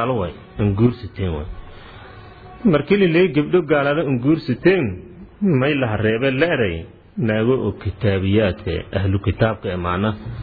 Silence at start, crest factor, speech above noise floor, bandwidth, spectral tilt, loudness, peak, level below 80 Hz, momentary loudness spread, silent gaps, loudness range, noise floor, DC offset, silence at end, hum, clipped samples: 0 s; 16 dB; 21 dB; 4.9 kHz; -10.5 dB/octave; -19 LUFS; -4 dBFS; -40 dBFS; 10 LU; none; 3 LU; -39 dBFS; under 0.1%; 0 s; none; under 0.1%